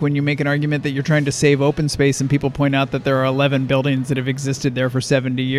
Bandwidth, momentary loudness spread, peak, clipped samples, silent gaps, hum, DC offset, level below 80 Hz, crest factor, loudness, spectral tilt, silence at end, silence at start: 13 kHz; 5 LU; -2 dBFS; under 0.1%; none; none; under 0.1%; -46 dBFS; 16 dB; -18 LUFS; -6 dB/octave; 0 s; 0 s